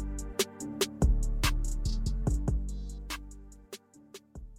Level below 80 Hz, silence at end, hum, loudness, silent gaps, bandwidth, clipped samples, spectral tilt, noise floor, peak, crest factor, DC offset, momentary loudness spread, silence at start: -34 dBFS; 0 s; none; -33 LUFS; none; 16 kHz; under 0.1%; -4.5 dB/octave; -54 dBFS; -16 dBFS; 16 dB; under 0.1%; 20 LU; 0 s